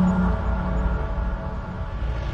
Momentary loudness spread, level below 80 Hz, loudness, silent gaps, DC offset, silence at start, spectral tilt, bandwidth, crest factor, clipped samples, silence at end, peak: 9 LU; -26 dBFS; -26 LUFS; none; under 0.1%; 0 s; -9 dB/octave; 7.2 kHz; 12 dB; under 0.1%; 0 s; -10 dBFS